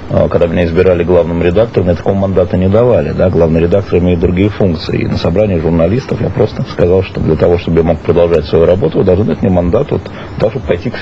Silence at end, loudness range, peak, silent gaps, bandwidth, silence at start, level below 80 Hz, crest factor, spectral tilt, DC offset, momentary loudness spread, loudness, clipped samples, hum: 0 s; 2 LU; 0 dBFS; none; 7.6 kHz; 0 s; -28 dBFS; 10 dB; -9 dB/octave; 1%; 5 LU; -11 LUFS; 0.1%; none